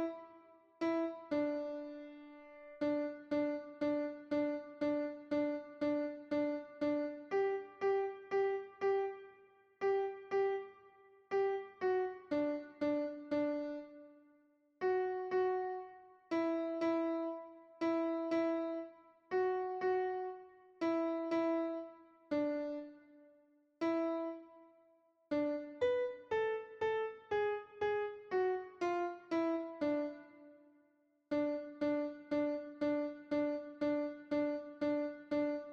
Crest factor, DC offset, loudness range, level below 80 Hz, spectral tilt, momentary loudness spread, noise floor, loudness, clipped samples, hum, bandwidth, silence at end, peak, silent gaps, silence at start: 14 dB; under 0.1%; 2 LU; -78 dBFS; -6.5 dB/octave; 9 LU; -75 dBFS; -38 LUFS; under 0.1%; none; 7.2 kHz; 0 s; -24 dBFS; none; 0 s